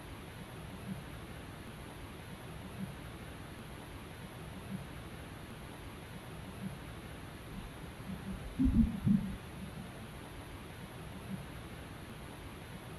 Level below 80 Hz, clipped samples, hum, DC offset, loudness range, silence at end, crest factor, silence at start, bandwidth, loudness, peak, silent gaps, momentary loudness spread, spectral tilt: -48 dBFS; under 0.1%; none; under 0.1%; 10 LU; 0 s; 24 dB; 0 s; 12.5 kHz; -42 LUFS; -16 dBFS; none; 15 LU; -6.5 dB/octave